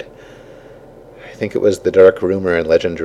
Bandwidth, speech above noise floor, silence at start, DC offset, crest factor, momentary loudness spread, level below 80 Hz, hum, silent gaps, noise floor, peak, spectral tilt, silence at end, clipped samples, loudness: 11.5 kHz; 26 dB; 0 s; under 0.1%; 16 dB; 13 LU; -48 dBFS; none; none; -40 dBFS; 0 dBFS; -6 dB/octave; 0 s; under 0.1%; -14 LUFS